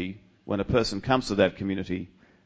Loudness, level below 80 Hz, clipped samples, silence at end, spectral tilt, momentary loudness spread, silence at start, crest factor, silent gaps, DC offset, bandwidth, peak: -27 LUFS; -46 dBFS; under 0.1%; 0.4 s; -6 dB/octave; 12 LU; 0 s; 20 dB; none; under 0.1%; 8 kHz; -8 dBFS